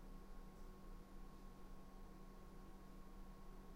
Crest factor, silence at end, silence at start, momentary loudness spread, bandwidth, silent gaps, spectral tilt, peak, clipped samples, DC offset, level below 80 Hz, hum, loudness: 12 dB; 0 s; 0 s; 1 LU; 16 kHz; none; -6 dB/octave; -44 dBFS; under 0.1%; under 0.1%; -58 dBFS; none; -62 LUFS